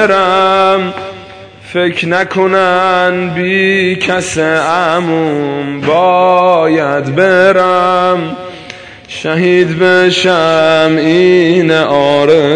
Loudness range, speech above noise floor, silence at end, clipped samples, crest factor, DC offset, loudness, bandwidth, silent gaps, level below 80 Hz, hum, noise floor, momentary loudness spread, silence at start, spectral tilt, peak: 3 LU; 22 dB; 0 s; 0.3%; 10 dB; under 0.1%; -10 LUFS; 10 kHz; none; -50 dBFS; none; -32 dBFS; 12 LU; 0 s; -5 dB/octave; 0 dBFS